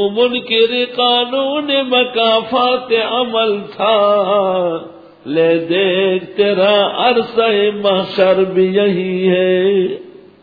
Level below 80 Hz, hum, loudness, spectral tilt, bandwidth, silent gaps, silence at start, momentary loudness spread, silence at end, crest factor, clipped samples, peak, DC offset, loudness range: -60 dBFS; none; -14 LUFS; -7.5 dB/octave; 5 kHz; none; 0 s; 4 LU; 0.3 s; 14 dB; under 0.1%; 0 dBFS; under 0.1%; 2 LU